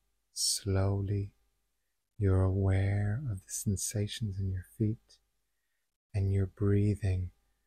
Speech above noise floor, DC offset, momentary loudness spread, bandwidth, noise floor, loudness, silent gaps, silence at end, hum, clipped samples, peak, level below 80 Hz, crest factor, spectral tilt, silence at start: 52 dB; under 0.1%; 8 LU; 15 kHz; -83 dBFS; -32 LUFS; 5.96-6.10 s; 0.35 s; none; under 0.1%; -18 dBFS; -54 dBFS; 14 dB; -5.5 dB/octave; 0.35 s